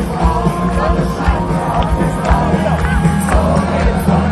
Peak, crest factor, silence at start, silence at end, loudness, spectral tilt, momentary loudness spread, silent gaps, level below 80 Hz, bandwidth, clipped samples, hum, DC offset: 0 dBFS; 14 dB; 0 s; 0 s; -15 LUFS; -7 dB/octave; 2 LU; none; -20 dBFS; 13 kHz; under 0.1%; none; under 0.1%